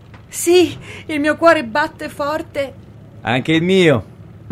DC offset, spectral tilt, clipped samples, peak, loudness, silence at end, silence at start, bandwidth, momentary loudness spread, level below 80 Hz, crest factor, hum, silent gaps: under 0.1%; -5 dB/octave; under 0.1%; 0 dBFS; -16 LUFS; 0 s; 0.1 s; 16 kHz; 13 LU; -48 dBFS; 16 dB; none; none